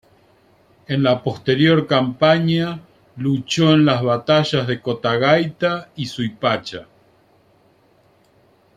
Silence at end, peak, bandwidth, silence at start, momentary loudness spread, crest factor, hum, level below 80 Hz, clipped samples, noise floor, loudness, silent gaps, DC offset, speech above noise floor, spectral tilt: 1.95 s; -2 dBFS; 10 kHz; 0.9 s; 11 LU; 18 dB; none; -56 dBFS; under 0.1%; -56 dBFS; -18 LUFS; none; under 0.1%; 38 dB; -6 dB/octave